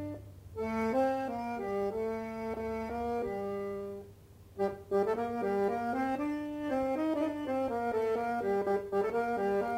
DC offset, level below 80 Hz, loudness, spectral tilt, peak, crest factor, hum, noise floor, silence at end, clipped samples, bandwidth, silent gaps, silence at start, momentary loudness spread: under 0.1%; -60 dBFS; -34 LUFS; -7 dB/octave; -20 dBFS; 14 dB; none; -55 dBFS; 0 s; under 0.1%; 16 kHz; none; 0 s; 8 LU